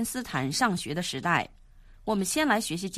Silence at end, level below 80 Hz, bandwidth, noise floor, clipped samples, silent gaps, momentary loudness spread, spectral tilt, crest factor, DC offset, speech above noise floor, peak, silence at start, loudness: 0 s; -54 dBFS; 15 kHz; -52 dBFS; under 0.1%; none; 6 LU; -3.5 dB/octave; 20 dB; under 0.1%; 24 dB; -8 dBFS; 0 s; -28 LUFS